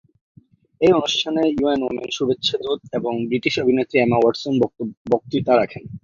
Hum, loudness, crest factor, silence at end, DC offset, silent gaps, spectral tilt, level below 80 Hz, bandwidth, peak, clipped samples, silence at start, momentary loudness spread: none; -20 LUFS; 18 dB; 0.05 s; under 0.1%; 4.97-5.05 s; -5.5 dB/octave; -54 dBFS; 7.4 kHz; -2 dBFS; under 0.1%; 0.8 s; 8 LU